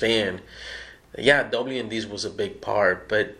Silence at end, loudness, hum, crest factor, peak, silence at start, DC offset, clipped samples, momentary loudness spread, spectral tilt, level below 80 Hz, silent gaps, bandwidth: 0.05 s; -24 LUFS; none; 22 dB; -2 dBFS; 0 s; under 0.1%; under 0.1%; 17 LU; -4 dB/octave; -54 dBFS; none; 12 kHz